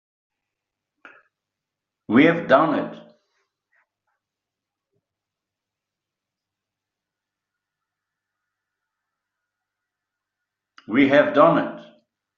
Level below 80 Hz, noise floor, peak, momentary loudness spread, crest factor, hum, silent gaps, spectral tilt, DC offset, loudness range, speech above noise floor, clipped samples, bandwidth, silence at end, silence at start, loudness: -68 dBFS; -86 dBFS; -2 dBFS; 11 LU; 24 dB; 50 Hz at -80 dBFS; none; -4.5 dB/octave; under 0.1%; 6 LU; 69 dB; under 0.1%; 6.6 kHz; 0.55 s; 2.1 s; -18 LUFS